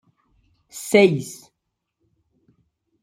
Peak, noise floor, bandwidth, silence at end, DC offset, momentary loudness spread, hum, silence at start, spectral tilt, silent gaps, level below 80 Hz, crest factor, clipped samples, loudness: -2 dBFS; -79 dBFS; 16 kHz; 1.7 s; under 0.1%; 24 LU; none; 0.75 s; -5 dB/octave; none; -68 dBFS; 22 dB; under 0.1%; -18 LUFS